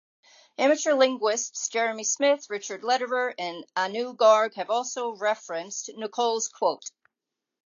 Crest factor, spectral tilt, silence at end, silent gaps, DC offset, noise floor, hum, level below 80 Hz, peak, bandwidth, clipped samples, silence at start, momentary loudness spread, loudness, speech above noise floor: 20 dB; -1 dB/octave; 0.75 s; none; under 0.1%; -86 dBFS; none; -88 dBFS; -6 dBFS; 7.6 kHz; under 0.1%; 0.6 s; 12 LU; -26 LUFS; 61 dB